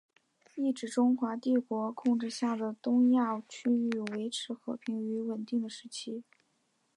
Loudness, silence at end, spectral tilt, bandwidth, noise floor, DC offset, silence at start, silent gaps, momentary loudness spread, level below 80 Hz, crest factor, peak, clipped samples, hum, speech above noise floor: -32 LUFS; 0.75 s; -5 dB/octave; 11 kHz; -75 dBFS; under 0.1%; 0.55 s; none; 12 LU; -86 dBFS; 14 dB; -18 dBFS; under 0.1%; none; 44 dB